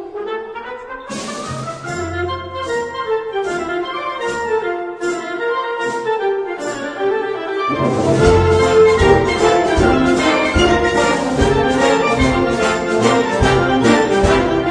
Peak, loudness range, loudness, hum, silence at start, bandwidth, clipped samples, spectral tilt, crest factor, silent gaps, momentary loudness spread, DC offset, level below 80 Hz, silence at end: 0 dBFS; 9 LU; -16 LUFS; none; 0 s; 10.5 kHz; under 0.1%; -5.5 dB/octave; 16 dB; none; 12 LU; under 0.1%; -30 dBFS; 0 s